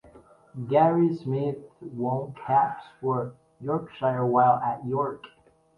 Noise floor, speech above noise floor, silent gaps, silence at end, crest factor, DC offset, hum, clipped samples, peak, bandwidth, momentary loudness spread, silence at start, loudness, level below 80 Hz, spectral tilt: -53 dBFS; 28 dB; none; 0.5 s; 18 dB; under 0.1%; none; under 0.1%; -8 dBFS; 5.6 kHz; 17 LU; 0.15 s; -26 LUFS; -66 dBFS; -10 dB/octave